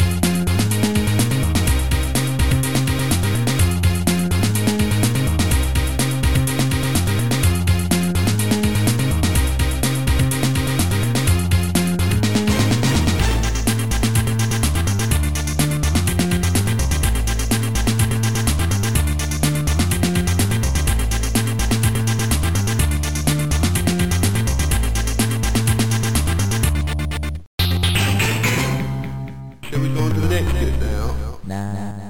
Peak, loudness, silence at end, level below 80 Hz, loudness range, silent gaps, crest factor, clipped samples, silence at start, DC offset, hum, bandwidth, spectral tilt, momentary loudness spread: -2 dBFS; -19 LUFS; 0 s; -24 dBFS; 2 LU; 27.47-27.58 s; 14 dB; under 0.1%; 0 s; 2%; none; 17 kHz; -5 dB/octave; 3 LU